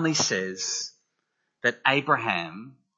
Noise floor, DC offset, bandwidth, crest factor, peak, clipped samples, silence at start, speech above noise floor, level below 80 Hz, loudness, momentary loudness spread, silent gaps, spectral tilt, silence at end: -78 dBFS; under 0.1%; 8 kHz; 24 dB; -4 dBFS; under 0.1%; 0 s; 51 dB; -74 dBFS; -25 LUFS; 15 LU; none; -2.5 dB/octave; 0.25 s